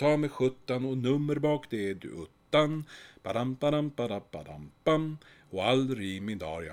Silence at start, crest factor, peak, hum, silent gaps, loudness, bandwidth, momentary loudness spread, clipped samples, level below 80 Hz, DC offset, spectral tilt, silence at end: 0 s; 18 dB; -12 dBFS; none; none; -31 LUFS; 15 kHz; 16 LU; under 0.1%; -62 dBFS; under 0.1%; -6.5 dB/octave; 0 s